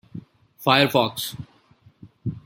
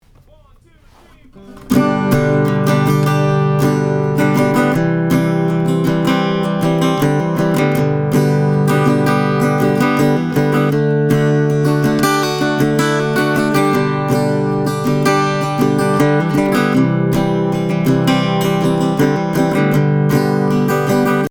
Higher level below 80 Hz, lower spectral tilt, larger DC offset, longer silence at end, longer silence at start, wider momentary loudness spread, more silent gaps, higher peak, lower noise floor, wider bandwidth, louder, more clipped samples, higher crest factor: second, -58 dBFS vs -44 dBFS; second, -4.5 dB/octave vs -6.5 dB/octave; neither; about the same, 0.05 s vs 0 s; second, 0.15 s vs 1.35 s; first, 24 LU vs 2 LU; neither; about the same, -2 dBFS vs 0 dBFS; first, -56 dBFS vs -46 dBFS; second, 17 kHz vs over 20 kHz; second, -21 LUFS vs -14 LUFS; neither; first, 24 dB vs 14 dB